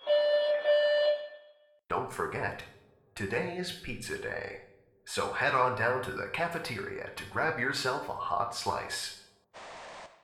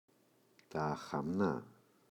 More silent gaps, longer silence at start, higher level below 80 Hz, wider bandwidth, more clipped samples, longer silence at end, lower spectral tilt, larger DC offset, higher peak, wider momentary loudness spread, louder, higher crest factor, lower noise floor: neither; second, 0 s vs 0.7 s; first, -60 dBFS vs -70 dBFS; about the same, 15 kHz vs 16 kHz; neither; second, 0.15 s vs 0.4 s; second, -3.5 dB/octave vs -7.5 dB/octave; neither; first, -14 dBFS vs -22 dBFS; first, 19 LU vs 9 LU; first, -31 LUFS vs -39 LUFS; about the same, 18 dB vs 20 dB; second, -60 dBFS vs -71 dBFS